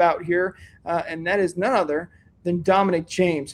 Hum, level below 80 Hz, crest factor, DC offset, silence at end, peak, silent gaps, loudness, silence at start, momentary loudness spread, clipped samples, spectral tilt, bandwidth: none; -56 dBFS; 18 dB; under 0.1%; 0 s; -6 dBFS; none; -23 LUFS; 0 s; 9 LU; under 0.1%; -6 dB/octave; 12 kHz